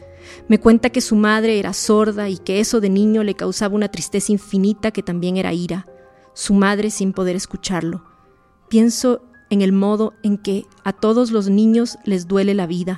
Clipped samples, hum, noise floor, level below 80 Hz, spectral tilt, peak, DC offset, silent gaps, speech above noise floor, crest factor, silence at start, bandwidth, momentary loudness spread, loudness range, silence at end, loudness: under 0.1%; none; -53 dBFS; -48 dBFS; -5.5 dB/octave; 0 dBFS; under 0.1%; none; 36 dB; 18 dB; 0 s; 12.5 kHz; 9 LU; 4 LU; 0 s; -18 LUFS